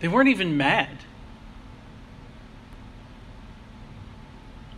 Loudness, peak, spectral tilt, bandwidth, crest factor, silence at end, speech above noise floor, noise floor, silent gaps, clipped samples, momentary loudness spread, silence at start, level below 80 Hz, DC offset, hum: -21 LUFS; -6 dBFS; -6 dB/octave; 11.5 kHz; 22 dB; 0 s; 23 dB; -45 dBFS; none; under 0.1%; 26 LU; 0 s; -48 dBFS; under 0.1%; none